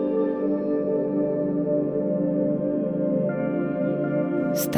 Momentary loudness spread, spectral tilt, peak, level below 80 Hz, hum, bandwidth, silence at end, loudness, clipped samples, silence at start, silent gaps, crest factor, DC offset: 1 LU; -7.5 dB/octave; -8 dBFS; -60 dBFS; none; 15.5 kHz; 0 s; -25 LUFS; under 0.1%; 0 s; none; 16 dB; under 0.1%